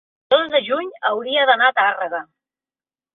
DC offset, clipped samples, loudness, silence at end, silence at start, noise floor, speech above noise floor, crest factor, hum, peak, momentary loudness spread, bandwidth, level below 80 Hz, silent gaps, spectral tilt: under 0.1%; under 0.1%; -18 LUFS; 0.9 s; 0.3 s; under -90 dBFS; over 71 dB; 18 dB; none; -2 dBFS; 11 LU; 4.3 kHz; -72 dBFS; none; -5.5 dB/octave